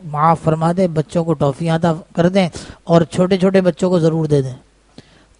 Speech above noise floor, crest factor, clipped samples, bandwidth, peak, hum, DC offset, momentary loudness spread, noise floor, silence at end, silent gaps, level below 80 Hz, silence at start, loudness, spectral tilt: 30 dB; 16 dB; under 0.1%; 10.5 kHz; 0 dBFS; none; under 0.1%; 5 LU; -45 dBFS; 0.8 s; none; -46 dBFS; 0 s; -16 LUFS; -7.5 dB/octave